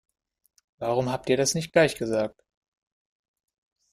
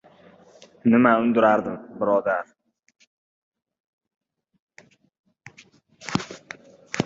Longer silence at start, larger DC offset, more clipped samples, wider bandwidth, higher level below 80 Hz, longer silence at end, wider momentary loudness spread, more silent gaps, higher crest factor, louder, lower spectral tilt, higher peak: about the same, 0.8 s vs 0.85 s; neither; neither; first, 15.5 kHz vs 7.8 kHz; about the same, -60 dBFS vs -64 dBFS; first, 1.65 s vs 0 s; second, 8 LU vs 23 LU; second, none vs 3.07-3.52 s, 3.80-3.98 s, 4.62-4.67 s, 5.19-5.24 s; about the same, 22 dB vs 22 dB; second, -25 LUFS vs -22 LUFS; second, -4 dB/octave vs -6 dB/octave; second, -6 dBFS vs -2 dBFS